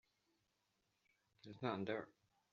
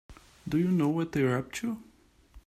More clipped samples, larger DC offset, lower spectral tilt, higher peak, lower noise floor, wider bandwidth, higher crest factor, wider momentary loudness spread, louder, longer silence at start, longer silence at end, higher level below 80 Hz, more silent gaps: neither; neither; second, -4.5 dB/octave vs -7 dB/octave; second, -26 dBFS vs -14 dBFS; first, -85 dBFS vs -56 dBFS; second, 7.2 kHz vs 14.5 kHz; first, 24 dB vs 16 dB; first, 18 LU vs 12 LU; second, -46 LUFS vs -29 LUFS; first, 1.45 s vs 0.1 s; first, 0.45 s vs 0.05 s; second, -88 dBFS vs -58 dBFS; neither